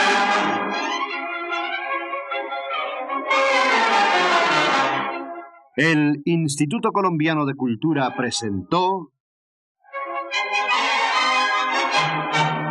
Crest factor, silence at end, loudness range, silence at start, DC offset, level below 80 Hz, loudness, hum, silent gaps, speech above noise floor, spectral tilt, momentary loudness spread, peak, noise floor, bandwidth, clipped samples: 16 dB; 0 s; 5 LU; 0 s; under 0.1%; -74 dBFS; -20 LUFS; none; 9.20-9.75 s; over 69 dB; -4 dB/octave; 10 LU; -4 dBFS; under -90 dBFS; 12 kHz; under 0.1%